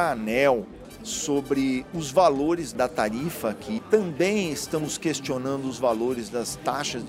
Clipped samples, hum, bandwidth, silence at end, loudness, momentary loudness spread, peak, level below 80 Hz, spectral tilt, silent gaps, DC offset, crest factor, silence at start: under 0.1%; none; 16 kHz; 0 s; -25 LUFS; 8 LU; -8 dBFS; -54 dBFS; -4.5 dB/octave; none; under 0.1%; 18 dB; 0 s